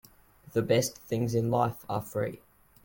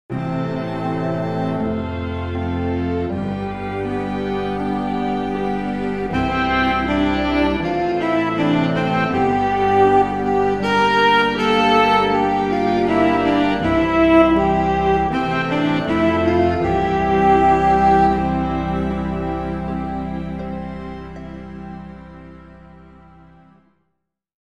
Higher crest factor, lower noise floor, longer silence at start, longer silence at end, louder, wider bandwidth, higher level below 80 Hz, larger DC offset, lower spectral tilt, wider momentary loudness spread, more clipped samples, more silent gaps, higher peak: about the same, 18 dB vs 16 dB; second, -56 dBFS vs -75 dBFS; first, 0.55 s vs 0.1 s; second, 0.5 s vs 1.7 s; second, -30 LUFS vs -18 LUFS; first, 17 kHz vs 10.5 kHz; second, -60 dBFS vs -36 dBFS; second, under 0.1% vs 0.4%; second, -5.5 dB/octave vs -7 dB/octave; second, 8 LU vs 11 LU; neither; neither; second, -12 dBFS vs -2 dBFS